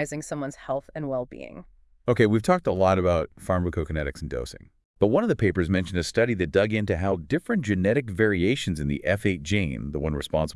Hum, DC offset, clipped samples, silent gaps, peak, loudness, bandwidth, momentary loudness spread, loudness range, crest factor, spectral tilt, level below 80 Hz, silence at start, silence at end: none; under 0.1%; under 0.1%; 4.85-4.94 s; -6 dBFS; -25 LUFS; 12 kHz; 11 LU; 1 LU; 20 dB; -6.5 dB/octave; -44 dBFS; 0 s; 0 s